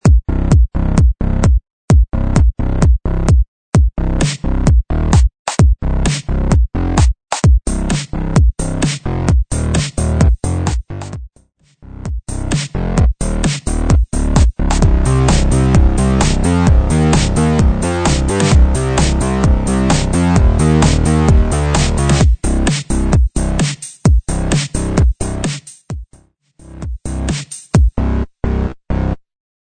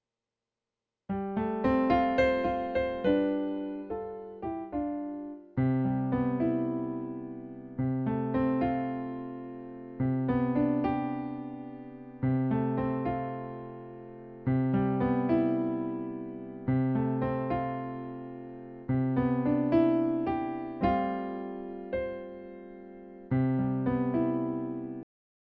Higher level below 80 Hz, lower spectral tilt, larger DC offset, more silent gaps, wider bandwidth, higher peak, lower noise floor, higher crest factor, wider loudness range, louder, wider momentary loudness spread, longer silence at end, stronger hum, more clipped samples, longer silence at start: first, -16 dBFS vs -54 dBFS; second, -6 dB/octave vs -10.5 dB/octave; neither; first, 1.70-1.88 s, 3.48-3.72 s, 5.39-5.45 s vs none; first, 9.4 kHz vs 5 kHz; first, 0 dBFS vs -14 dBFS; second, -52 dBFS vs under -90 dBFS; about the same, 12 dB vs 16 dB; first, 7 LU vs 4 LU; first, -15 LUFS vs -30 LUFS; second, 8 LU vs 15 LU; about the same, 0.45 s vs 0.45 s; neither; neither; second, 0.05 s vs 1.1 s